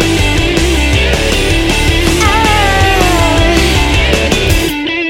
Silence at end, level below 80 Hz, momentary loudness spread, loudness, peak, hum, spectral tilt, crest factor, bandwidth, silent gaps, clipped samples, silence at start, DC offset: 0 s; -16 dBFS; 2 LU; -10 LUFS; 0 dBFS; none; -4 dB/octave; 10 dB; 16.5 kHz; none; under 0.1%; 0 s; under 0.1%